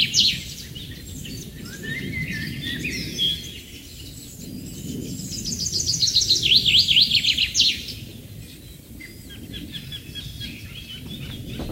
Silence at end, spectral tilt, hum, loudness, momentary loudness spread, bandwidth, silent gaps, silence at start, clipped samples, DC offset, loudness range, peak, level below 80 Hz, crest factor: 0 s; -1.5 dB/octave; none; -19 LUFS; 24 LU; 16 kHz; none; 0 s; under 0.1%; under 0.1%; 17 LU; -4 dBFS; -44 dBFS; 22 dB